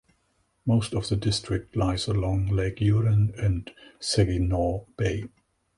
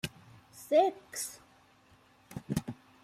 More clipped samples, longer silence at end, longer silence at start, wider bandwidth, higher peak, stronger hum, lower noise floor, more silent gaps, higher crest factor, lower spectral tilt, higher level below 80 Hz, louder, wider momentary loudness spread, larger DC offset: neither; first, 0.5 s vs 0.3 s; first, 0.65 s vs 0.05 s; second, 11.5 kHz vs 15.5 kHz; first, -10 dBFS vs -14 dBFS; neither; first, -70 dBFS vs -63 dBFS; neither; about the same, 16 dB vs 20 dB; first, -6 dB/octave vs -4.5 dB/octave; first, -40 dBFS vs -64 dBFS; first, -26 LUFS vs -32 LUFS; second, 9 LU vs 24 LU; neither